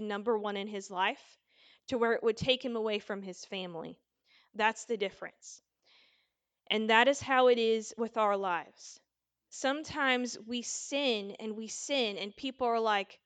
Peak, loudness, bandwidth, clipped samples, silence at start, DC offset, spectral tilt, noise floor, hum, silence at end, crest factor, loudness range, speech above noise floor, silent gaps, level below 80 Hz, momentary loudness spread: -10 dBFS; -32 LUFS; 9.4 kHz; under 0.1%; 0 s; under 0.1%; -3 dB/octave; -79 dBFS; none; 0.1 s; 24 dB; 7 LU; 47 dB; none; -72 dBFS; 19 LU